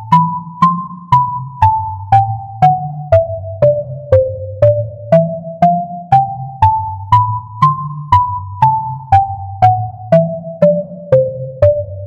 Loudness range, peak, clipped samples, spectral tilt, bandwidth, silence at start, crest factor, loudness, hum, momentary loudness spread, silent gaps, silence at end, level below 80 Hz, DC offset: 0 LU; 0 dBFS; 0.1%; -9 dB/octave; 7.6 kHz; 0 s; 14 dB; -14 LUFS; none; 7 LU; none; 0 s; -40 dBFS; under 0.1%